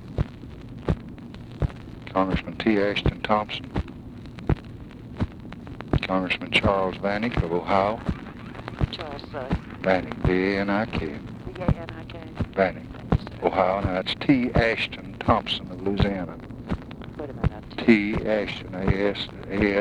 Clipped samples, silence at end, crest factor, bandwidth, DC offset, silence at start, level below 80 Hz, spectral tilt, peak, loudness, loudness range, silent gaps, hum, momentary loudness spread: under 0.1%; 0 s; 22 dB; 11 kHz; under 0.1%; 0 s; -38 dBFS; -7.5 dB/octave; -4 dBFS; -26 LUFS; 3 LU; none; none; 16 LU